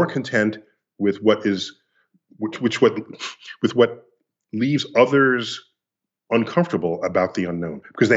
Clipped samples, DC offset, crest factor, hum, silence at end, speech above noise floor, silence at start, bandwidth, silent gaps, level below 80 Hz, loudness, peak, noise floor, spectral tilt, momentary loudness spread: under 0.1%; under 0.1%; 20 dB; none; 0 s; 65 dB; 0 s; 8 kHz; none; -66 dBFS; -21 LUFS; -2 dBFS; -86 dBFS; -6 dB/octave; 15 LU